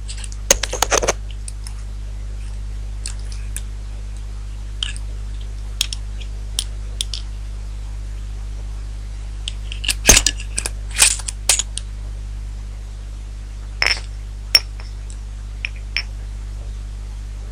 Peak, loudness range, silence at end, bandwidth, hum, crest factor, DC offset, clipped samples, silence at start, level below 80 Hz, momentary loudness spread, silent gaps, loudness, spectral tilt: 0 dBFS; 13 LU; 0 s; 16 kHz; 50 Hz at -25 dBFS; 24 dB; under 0.1%; under 0.1%; 0 s; -28 dBFS; 17 LU; none; -21 LUFS; -1.5 dB/octave